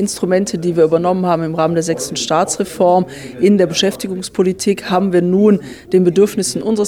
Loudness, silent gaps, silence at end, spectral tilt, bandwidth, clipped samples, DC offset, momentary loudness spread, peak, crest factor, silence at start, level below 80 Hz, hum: -15 LUFS; none; 0 s; -5 dB/octave; 17 kHz; under 0.1%; 0.1%; 6 LU; -2 dBFS; 12 dB; 0 s; -50 dBFS; none